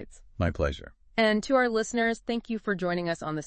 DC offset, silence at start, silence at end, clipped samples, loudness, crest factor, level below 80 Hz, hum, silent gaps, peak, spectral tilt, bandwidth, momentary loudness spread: under 0.1%; 0 s; 0 s; under 0.1%; -28 LUFS; 18 dB; -46 dBFS; none; none; -10 dBFS; -5 dB/octave; 8.8 kHz; 8 LU